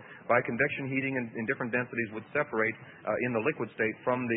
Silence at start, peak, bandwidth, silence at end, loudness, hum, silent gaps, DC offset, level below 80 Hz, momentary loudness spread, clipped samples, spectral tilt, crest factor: 0 s; -12 dBFS; 4 kHz; 0 s; -31 LUFS; none; none; under 0.1%; -70 dBFS; 5 LU; under 0.1%; -10.5 dB/octave; 20 dB